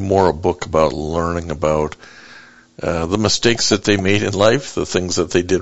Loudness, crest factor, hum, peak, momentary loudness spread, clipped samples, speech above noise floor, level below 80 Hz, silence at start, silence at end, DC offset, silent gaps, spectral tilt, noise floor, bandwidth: -17 LUFS; 18 dB; none; 0 dBFS; 7 LU; under 0.1%; 26 dB; -42 dBFS; 0 s; 0 s; under 0.1%; none; -4.5 dB/octave; -43 dBFS; 8.2 kHz